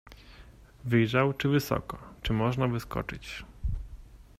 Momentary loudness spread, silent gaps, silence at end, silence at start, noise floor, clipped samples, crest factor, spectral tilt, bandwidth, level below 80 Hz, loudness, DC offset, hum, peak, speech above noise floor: 16 LU; none; 0.15 s; 0.05 s; -52 dBFS; under 0.1%; 20 dB; -6.5 dB/octave; 15.5 kHz; -44 dBFS; -29 LUFS; under 0.1%; none; -12 dBFS; 24 dB